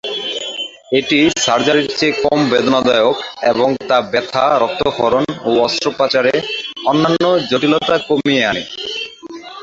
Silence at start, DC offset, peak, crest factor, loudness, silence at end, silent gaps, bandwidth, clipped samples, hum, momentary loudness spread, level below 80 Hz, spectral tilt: 0.05 s; under 0.1%; 0 dBFS; 14 dB; -15 LUFS; 0 s; none; 8 kHz; under 0.1%; none; 9 LU; -52 dBFS; -4 dB/octave